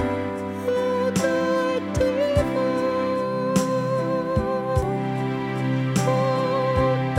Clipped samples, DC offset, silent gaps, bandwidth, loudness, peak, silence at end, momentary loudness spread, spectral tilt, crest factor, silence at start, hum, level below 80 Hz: under 0.1%; under 0.1%; none; 16 kHz; -23 LUFS; -6 dBFS; 0 s; 4 LU; -6.5 dB/octave; 16 dB; 0 s; none; -40 dBFS